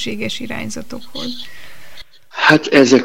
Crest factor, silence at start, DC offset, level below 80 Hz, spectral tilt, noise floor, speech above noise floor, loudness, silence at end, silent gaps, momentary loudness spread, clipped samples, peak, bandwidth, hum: 18 dB; 0 s; 4%; -52 dBFS; -4 dB/octave; -36 dBFS; 19 dB; -16 LUFS; 0 s; none; 20 LU; under 0.1%; 0 dBFS; 16.5 kHz; none